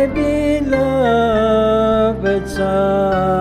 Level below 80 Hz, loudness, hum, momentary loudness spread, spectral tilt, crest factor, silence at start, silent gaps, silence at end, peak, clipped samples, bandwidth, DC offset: -32 dBFS; -15 LUFS; none; 4 LU; -7 dB/octave; 12 dB; 0 s; none; 0 s; -4 dBFS; under 0.1%; 14.5 kHz; under 0.1%